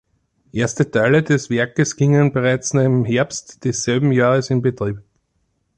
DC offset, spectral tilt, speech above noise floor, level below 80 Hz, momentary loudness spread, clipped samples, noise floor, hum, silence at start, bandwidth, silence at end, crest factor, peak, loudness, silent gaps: under 0.1%; -6 dB/octave; 51 dB; -52 dBFS; 9 LU; under 0.1%; -68 dBFS; none; 0.55 s; 9.8 kHz; 0.8 s; 14 dB; -4 dBFS; -18 LUFS; none